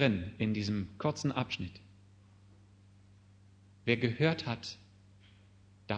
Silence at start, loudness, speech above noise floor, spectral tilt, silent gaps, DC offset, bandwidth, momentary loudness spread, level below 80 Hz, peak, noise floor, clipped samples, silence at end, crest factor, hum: 0 s; -34 LUFS; 28 dB; -6 dB/octave; none; under 0.1%; 9.6 kHz; 15 LU; -64 dBFS; -12 dBFS; -60 dBFS; under 0.1%; 0 s; 24 dB; none